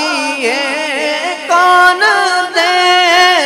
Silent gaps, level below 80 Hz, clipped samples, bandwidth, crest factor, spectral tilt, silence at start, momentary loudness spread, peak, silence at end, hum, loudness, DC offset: none; -58 dBFS; 0.3%; 16 kHz; 10 dB; 0 dB/octave; 0 s; 8 LU; 0 dBFS; 0 s; none; -10 LUFS; under 0.1%